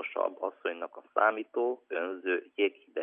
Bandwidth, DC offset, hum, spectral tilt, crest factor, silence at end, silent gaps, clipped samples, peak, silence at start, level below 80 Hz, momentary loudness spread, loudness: 3.7 kHz; under 0.1%; none; -6 dB/octave; 22 dB; 0 s; none; under 0.1%; -12 dBFS; 0 s; under -90 dBFS; 8 LU; -32 LUFS